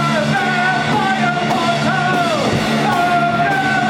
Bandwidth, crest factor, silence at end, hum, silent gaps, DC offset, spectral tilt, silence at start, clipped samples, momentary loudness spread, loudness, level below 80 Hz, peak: 17 kHz; 12 dB; 0 s; none; none; under 0.1%; -5 dB/octave; 0 s; under 0.1%; 1 LU; -15 LUFS; -48 dBFS; -4 dBFS